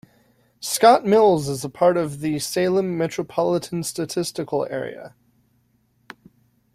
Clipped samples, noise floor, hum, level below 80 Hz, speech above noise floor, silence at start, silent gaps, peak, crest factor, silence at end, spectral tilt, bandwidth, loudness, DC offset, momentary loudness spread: under 0.1%; -64 dBFS; none; -62 dBFS; 44 dB; 0.6 s; none; -2 dBFS; 20 dB; 1.65 s; -5 dB/octave; 16 kHz; -21 LUFS; under 0.1%; 13 LU